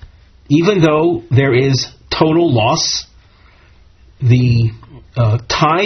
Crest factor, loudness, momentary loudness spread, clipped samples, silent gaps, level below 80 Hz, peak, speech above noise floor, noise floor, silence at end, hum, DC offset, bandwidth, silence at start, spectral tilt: 14 dB; -14 LUFS; 8 LU; under 0.1%; none; -40 dBFS; 0 dBFS; 33 dB; -46 dBFS; 0 s; none; under 0.1%; 6.6 kHz; 0 s; -5.5 dB/octave